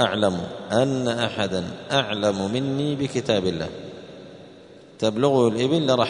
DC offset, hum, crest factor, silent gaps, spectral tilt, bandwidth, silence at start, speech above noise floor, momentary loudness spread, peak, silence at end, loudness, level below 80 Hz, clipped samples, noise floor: under 0.1%; none; 20 dB; none; -5.5 dB/octave; 10.5 kHz; 0 s; 24 dB; 17 LU; -4 dBFS; 0 s; -23 LUFS; -58 dBFS; under 0.1%; -46 dBFS